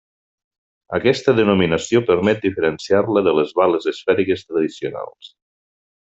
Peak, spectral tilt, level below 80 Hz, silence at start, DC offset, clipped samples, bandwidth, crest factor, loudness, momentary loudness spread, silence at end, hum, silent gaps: -2 dBFS; -6 dB/octave; -56 dBFS; 0.9 s; under 0.1%; under 0.1%; 8 kHz; 16 dB; -18 LUFS; 9 LU; 0.8 s; none; none